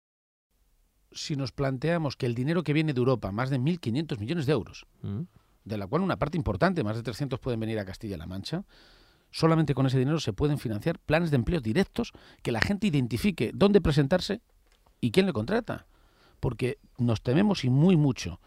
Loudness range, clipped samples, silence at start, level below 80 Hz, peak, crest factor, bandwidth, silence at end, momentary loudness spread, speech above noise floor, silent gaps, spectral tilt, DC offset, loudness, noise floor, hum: 4 LU; under 0.1%; 1.15 s; -48 dBFS; -2 dBFS; 26 dB; 15 kHz; 0.1 s; 13 LU; 40 dB; none; -7 dB/octave; under 0.1%; -28 LUFS; -67 dBFS; none